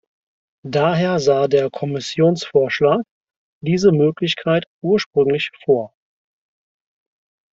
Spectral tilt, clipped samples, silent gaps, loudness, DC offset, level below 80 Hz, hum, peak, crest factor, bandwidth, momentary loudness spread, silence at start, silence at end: -6 dB/octave; under 0.1%; 3.11-3.24 s, 3.36-3.61 s, 4.67-4.82 s, 5.06-5.11 s; -18 LUFS; under 0.1%; -58 dBFS; none; -2 dBFS; 16 dB; 7.8 kHz; 8 LU; 0.65 s; 1.65 s